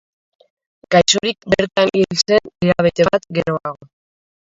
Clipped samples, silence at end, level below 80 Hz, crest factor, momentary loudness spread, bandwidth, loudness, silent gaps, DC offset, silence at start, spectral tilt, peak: under 0.1%; 0.75 s; -48 dBFS; 18 dB; 7 LU; 7.8 kHz; -16 LUFS; none; under 0.1%; 0.9 s; -4 dB/octave; 0 dBFS